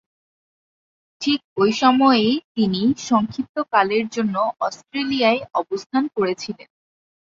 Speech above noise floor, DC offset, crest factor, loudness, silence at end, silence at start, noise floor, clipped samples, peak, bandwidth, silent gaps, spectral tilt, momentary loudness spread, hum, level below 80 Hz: over 70 dB; under 0.1%; 18 dB; -20 LUFS; 0.65 s; 1.2 s; under -90 dBFS; under 0.1%; -2 dBFS; 7.6 kHz; 1.44-1.56 s, 2.44-2.55 s, 3.49-3.54 s, 5.86-5.90 s; -5 dB/octave; 11 LU; none; -62 dBFS